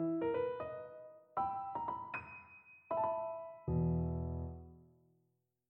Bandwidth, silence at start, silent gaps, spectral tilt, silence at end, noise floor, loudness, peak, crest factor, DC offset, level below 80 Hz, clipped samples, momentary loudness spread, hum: 4 kHz; 0 s; none; -11 dB/octave; 0.85 s; -81 dBFS; -40 LUFS; -24 dBFS; 16 dB; under 0.1%; -54 dBFS; under 0.1%; 18 LU; none